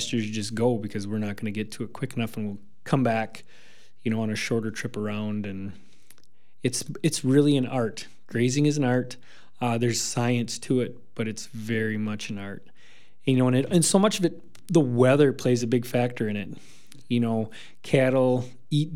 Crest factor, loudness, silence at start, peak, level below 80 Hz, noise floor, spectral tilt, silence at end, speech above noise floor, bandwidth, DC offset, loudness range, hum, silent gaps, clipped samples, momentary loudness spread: 20 dB; -26 LUFS; 0 s; -6 dBFS; -70 dBFS; -65 dBFS; -5.5 dB/octave; 0 s; 39 dB; 16.5 kHz; 1%; 7 LU; none; none; under 0.1%; 14 LU